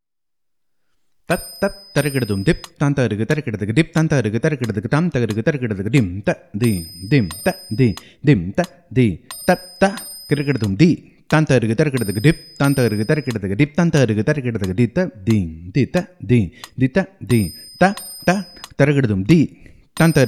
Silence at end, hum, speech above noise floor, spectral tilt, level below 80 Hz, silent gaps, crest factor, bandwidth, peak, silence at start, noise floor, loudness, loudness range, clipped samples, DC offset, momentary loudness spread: 0 s; none; 61 dB; -6.5 dB/octave; -44 dBFS; none; 18 dB; 14.5 kHz; 0 dBFS; 1.3 s; -79 dBFS; -19 LUFS; 2 LU; under 0.1%; 0.1%; 7 LU